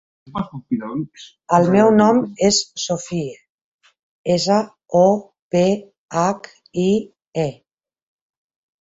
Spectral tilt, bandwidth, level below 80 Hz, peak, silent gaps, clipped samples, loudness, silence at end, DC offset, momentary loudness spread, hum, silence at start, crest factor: -5 dB/octave; 8 kHz; -56 dBFS; -2 dBFS; 3.49-3.79 s, 4.03-4.24 s, 5.42-5.50 s, 5.98-6.08 s, 7.27-7.32 s; under 0.1%; -19 LUFS; 1.3 s; under 0.1%; 15 LU; none; 0.35 s; 18 dB